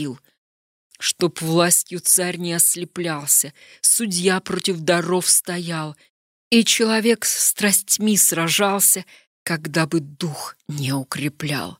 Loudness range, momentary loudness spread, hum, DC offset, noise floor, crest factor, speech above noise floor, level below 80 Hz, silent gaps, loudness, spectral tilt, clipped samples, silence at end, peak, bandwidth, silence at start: 3 LU; 12 LU; none; under 0.1%; under -90 dBFS; 18 dB; over 70 dB; -68 dBFS; 0.38-0.90 s, 6.09-6.51 s, 9.27-9.46 s; -18 LUFS; -2.5 dB/octave; under 0.1%; 0.05 s; -2 dBFS; 16 kHz; 0 s